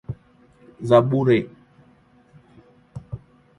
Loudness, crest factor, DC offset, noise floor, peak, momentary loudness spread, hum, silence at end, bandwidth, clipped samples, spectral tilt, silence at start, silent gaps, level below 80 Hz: -19 LUFS; 22 dB; under 0.1%; -55 dBFS; -2 dBFS; 23 LU; none; 0.4 s; 11 kHz; under 0.1%; -8.5 dB/octave; 0.1 s; none; -54 dBFS